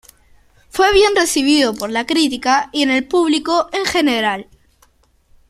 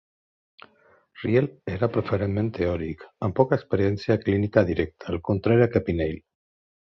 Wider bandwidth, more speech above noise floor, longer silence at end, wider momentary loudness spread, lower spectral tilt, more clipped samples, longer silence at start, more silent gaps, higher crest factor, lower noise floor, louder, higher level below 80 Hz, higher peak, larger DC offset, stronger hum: first, 14.5 kHz vs 6 kHz; first, 40 dB vs 36 dB; first, 1.05 s vs 0.65 s; second, 6 LU vs 10 LU; second, -2.5 dB/octave vs -9.5 dB/octave; neither; second, 0.75 s vs 1.15 s; neither; second, 16 dB vs 22 dB; second, -55 dBFS vs -60 dBFS; first, -15 LUFS vs -25 LUFS; about the same, -44 dBFS vs -44 dBFS; first, 0 dBFS vs -4 dBFS; neither; neither